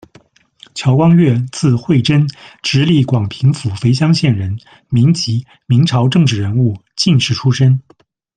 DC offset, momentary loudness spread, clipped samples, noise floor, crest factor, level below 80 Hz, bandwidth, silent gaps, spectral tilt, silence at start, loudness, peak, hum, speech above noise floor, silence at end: under 0.1%; 8 LU; under 0.1%; -48 dBFS; 12 dB; -48 dBFS; 9.4 kHz; none; -6.5 dB/octave; 0.75 s; -14 LUFS; 0 dBFS; none; 35 dB; 0.55 s